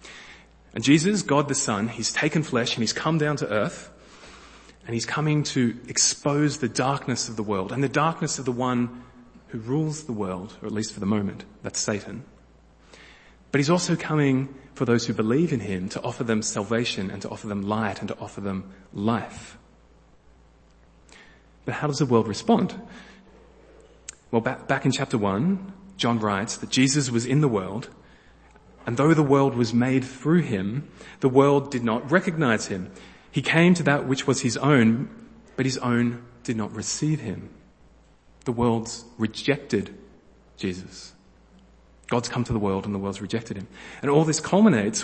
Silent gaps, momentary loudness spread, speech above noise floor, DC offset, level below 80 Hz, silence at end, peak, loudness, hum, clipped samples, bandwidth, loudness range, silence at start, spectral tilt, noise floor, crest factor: none; 16 LU; 31 dB; under 0.1%; -56 dBFS; 0 s; -2 dBFS; -24 LUFS; none; under 0.1%; 8.8 kHz; 8 LU; 0.05 s; -5 dB/octave; -55 dBFS; 24 dB